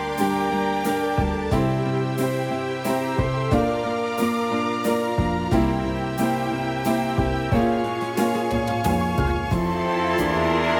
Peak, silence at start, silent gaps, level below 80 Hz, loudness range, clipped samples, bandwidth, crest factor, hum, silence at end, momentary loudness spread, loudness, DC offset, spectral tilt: -6 dBFS; 0 s; none; -36 dBFS; 1 LU; under 0.1%; 17 kHz; 16 dB; none; 0 s; 3 LU; -23 LUFS; under 0.1%; -6.5 dB/octave